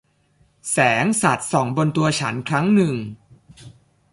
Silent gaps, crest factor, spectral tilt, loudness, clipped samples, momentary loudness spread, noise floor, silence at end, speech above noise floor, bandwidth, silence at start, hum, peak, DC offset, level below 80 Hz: none; 18 dB; -5 dB/octave; -19 LUFS; under 0.1%; 8 LU; -60 dBFS; 0.4 s; 41 dB; 11.5 kHz; 0.65 s; none; -4 dBFS; under 0.1%; -58 dBFS